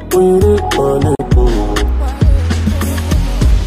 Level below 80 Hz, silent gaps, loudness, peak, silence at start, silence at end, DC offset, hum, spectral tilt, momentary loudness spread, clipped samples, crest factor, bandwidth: -14 dBFS; none; -13 LUFS; 0 dBFS; 0 s; 0 s; under 0.1%; none; -6.5 dB/octave; 5 LU; under 0.1%; 10 dB; 15.5 kHz